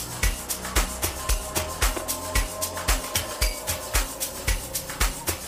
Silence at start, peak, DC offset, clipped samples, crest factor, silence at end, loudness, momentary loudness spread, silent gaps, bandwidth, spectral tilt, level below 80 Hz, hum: 0 s; -8 dBFS; under 0.1%; under 0.1%; 20 dB; 0 s; -27 LUFS; 4 LU; none; 15.5 kHz; -2.5 dB/octave; -30 dBFS; none